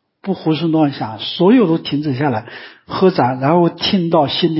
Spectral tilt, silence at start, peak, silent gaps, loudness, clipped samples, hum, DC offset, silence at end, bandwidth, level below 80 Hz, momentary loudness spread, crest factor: -10.5 dB/octave; 0.25 s; -2 dBFS; none; -15 LUFS; under 0.1%; none; under 0.1%; 0 s; 5.8 kHz; -54 dBFS; 12 LU; 14 dB